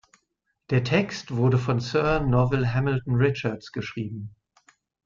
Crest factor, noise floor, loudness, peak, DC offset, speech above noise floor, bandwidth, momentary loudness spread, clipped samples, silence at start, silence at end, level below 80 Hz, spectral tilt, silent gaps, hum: 16 dB; -76 dBFS; -25 LUFS; -8 dBFS; under 0.1%; 52 dB; 7.4 kHz; 11 LU; under 0.1%; 0.7 s; 0.75 s; -46 dBFS; -7.5 dB/octave; none; none